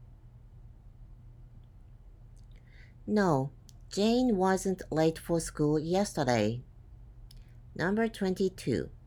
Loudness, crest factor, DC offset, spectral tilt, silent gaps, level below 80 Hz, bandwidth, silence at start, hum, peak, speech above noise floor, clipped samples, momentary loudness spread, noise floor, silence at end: -30 LUFS; 18 dB; under 0.1%; -6 dB/octave; none; -52 dBFS; 18 kHz; 0 s; none; -14 dBFS; 23 dB; under 0.1%; 7 LU; -52 dBFS; 0 s